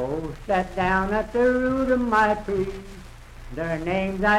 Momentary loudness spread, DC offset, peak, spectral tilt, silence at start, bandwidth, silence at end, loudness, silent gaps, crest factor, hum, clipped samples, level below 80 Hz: 13 LU; under 0.1%; -8 dBFS; -6.5 dB/octave; 0 s; 14 kHz; 0 s; -23 LUFS; none; 14 dB; none; under 0.1%; -40 dBFS